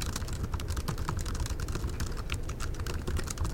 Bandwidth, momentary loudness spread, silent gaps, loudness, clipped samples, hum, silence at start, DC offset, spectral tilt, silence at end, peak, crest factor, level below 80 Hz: 17 kHz; 2 LU; none; -36 LUFS; under 0.1%; none; 0 s; under 0.1%; -4.5 dB/octave; 0 s; -14 dBFS; 20 dB; -36 dBFS